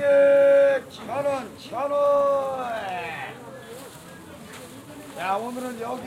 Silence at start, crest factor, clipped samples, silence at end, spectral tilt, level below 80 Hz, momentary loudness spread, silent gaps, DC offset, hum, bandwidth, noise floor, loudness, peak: 0 s; 14 dB; under 0.1%; 0 s; -4.5 dB/octave; -64 dBFS; 24 LU; none; under 0.1%; none; 15 kHz; -43 dBFS; -23 LUFS; -10 dBFS